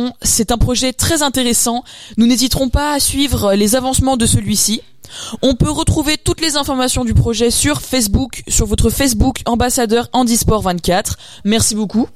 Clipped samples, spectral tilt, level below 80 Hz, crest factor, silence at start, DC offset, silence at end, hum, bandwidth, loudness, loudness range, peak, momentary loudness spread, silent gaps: under 0.1%; -4 dB/octave; -26 dBFS; 12 dB; 0 s; 1%; 0 s; none; 16 kHz; -14 LUFS; 1 LU; -4 dBFS; 4 LU; none